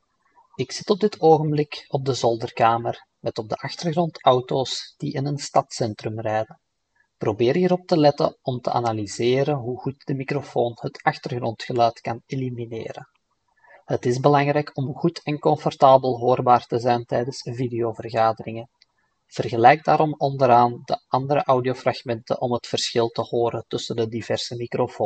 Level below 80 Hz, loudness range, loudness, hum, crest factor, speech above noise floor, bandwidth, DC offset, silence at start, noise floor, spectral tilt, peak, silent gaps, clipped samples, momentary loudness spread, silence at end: -64 dBFS; 6 LU; -22 LUFS; none; 22 dB; 47 dB; 9 kHz; under 0.1%; 0.6 s; -69 dBFS; -6 dB/octave; 0 dBFS; none; under 0.1%; 12 LU; 0 s